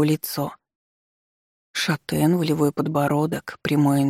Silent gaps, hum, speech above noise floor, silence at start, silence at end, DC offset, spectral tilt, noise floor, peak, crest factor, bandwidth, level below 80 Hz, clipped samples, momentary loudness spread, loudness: 0.75-1.74 s; none; over 69 dB; 0 s; 0 s; under 0.1%; -6 dB/octave; under -90 dBFS; -8 dBFS; 14 dB; 16.5 kHz; -58 dBFS; under 0.1%; 8 LU; -23 LUFS